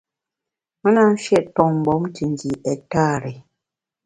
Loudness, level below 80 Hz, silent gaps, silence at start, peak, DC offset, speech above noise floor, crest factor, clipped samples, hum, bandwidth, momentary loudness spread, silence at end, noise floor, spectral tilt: -19 LUFS; -52 dBFS; none; 0.85 s; 0 dBFS; under 0.1%; 67 dB; 20 dB; under 0.1%; none; 10 kHz; 9 LU; 0.65 s; -86 dBFS; -7 dB/octave